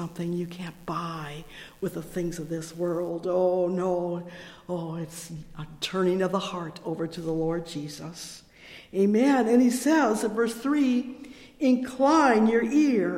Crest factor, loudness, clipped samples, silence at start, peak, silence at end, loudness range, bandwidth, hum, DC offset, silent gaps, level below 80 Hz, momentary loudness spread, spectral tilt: 18 dB; -26 LUFS; under 0.1%; 0 s; -8 dBFS; 0 s; 7 LU; 16.5 kHz; none; under 0.1%; none; -56 dBFS; 19 LU; -5.5 dB/octave